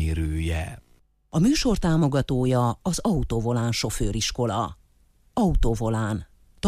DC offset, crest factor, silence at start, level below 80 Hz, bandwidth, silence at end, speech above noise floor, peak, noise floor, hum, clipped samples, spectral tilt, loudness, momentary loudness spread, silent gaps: under 0.1%; 14 dB; 0 s; -32 dBFS; 15.5 kHz; 0 s; 37 dB; -10 dBFS; -60 dBFS; none; under 0.1%; -5.5 dB/octave; -25 LUFS; 8 LU; none